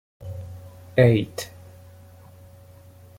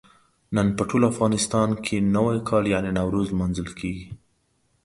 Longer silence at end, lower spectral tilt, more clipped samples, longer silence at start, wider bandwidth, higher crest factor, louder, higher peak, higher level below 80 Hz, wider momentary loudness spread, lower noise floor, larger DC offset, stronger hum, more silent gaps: first, 1.7 s vs 0.7 s; about the same, -7 dB/octave vs -6 dB/octave; neither; second, 0.2 s vs 0.5 s; first, 16.5 kHz vs 11.5 kHz; about the same, 22 dB vs 20 dB; about the same, -21 LUFS vs -23 LUFS; about the same, -4 dBFS vs -4 dBFS; second, -54 dBFS vs -46 dBFS; first, 22 LU vs 10 LU; second, -48 dBFS vs -68 dBFS; neither; neither; neither